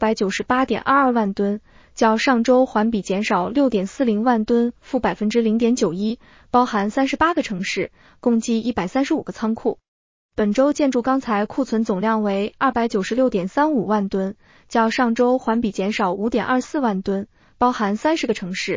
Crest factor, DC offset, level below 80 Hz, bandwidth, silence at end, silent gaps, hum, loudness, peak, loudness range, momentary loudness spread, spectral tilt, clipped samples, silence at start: 16 dB; under 0.1%; -52 dBFS; 7.6 kHz; 0 s; 9.88-10.29 s; none; -20 LUFS; -4 dBFS; 3 LU; 7 LU; -5.5 dB/octave; under 0.1%; 0 s